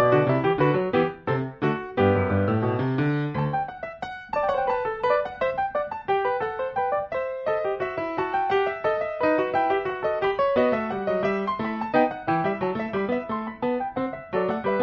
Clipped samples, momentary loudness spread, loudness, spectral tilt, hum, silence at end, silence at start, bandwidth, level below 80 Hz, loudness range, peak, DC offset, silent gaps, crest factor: under 0.1%; 6 LU; -25 LUFS; -9 dB/octave; none; 0 s; 0 s; 6.6 kHz; -56 dBFS; 2 LU; -8 dBFS; under 0.1%; none; 16 dB